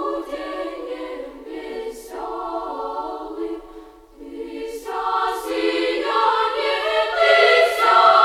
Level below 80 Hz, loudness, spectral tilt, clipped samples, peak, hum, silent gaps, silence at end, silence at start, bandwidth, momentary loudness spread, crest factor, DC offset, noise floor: -54 dBFS; -20 LUFS; -2 dB/octave; under 0.1%; -2 dBFS; none; none; 0 s; 0 s; 15.5 kHz; 18 LU; 18 dB; under 0.1%; -42 dBFS